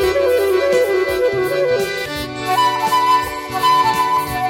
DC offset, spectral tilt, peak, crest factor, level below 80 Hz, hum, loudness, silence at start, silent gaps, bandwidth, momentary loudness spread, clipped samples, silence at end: under 0.1%; -4 dB/octave; -4 dBFS; 12 dB; -42 dBFS; none; -16 LUFS; 0 s; none; 16.5 kHz; 7 LU; under 0.1%; 0 s